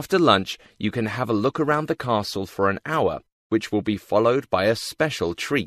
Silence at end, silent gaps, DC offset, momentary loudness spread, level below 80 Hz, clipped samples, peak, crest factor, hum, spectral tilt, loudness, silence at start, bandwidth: 0 s; 3.32-3.50 s; under 0.1%; 7 LU; -56 dBFS; under 0.1%; -2 dBFS; 22 dB; none; -5.5 dB/octave; -23 LUFS; 0 s; 14 kHz